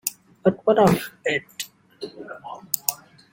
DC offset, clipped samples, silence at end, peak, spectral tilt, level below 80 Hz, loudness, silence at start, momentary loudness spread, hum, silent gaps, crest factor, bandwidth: under 0.1%; under 0.1%; 0.35 s; 0 dBFS; -4.5 dB/octave; -58 dBFS; -22 LUFS; 0.05 s; 20 LU; none; none; 24 dB; 17 kHz